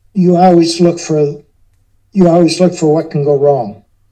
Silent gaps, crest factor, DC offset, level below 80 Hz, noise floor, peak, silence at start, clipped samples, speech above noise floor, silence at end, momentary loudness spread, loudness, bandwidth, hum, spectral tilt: none; 12 dB; under 0.1%; -50 dBFS; -52 dBFS; 0 dBFS; 0.15 s; 0.4%; 42 dB; 0.35 s; 9 LU; -11 LUFS; 9.6 kHz; none; -6.5 dB/octave